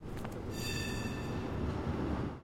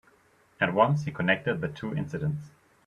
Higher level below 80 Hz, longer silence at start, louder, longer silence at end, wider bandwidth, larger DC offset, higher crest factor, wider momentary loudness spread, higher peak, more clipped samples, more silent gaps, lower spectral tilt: first, -46 dBFS vs -60 dBFS; second, 0 s vs 0.6 s; second, -38 LUFS vs -28 LUFS; second, 0 s vs 0.4 s; first, 16.5 kHz vs 7.2 kHz; neither; second, 14 dB vs 22 dB; second, 5 LU vs 9 LU; second, -24 dBFS vs -8 dBFS; neither; neither; second, -5.5 dB/octave vs -7.5 dB/octave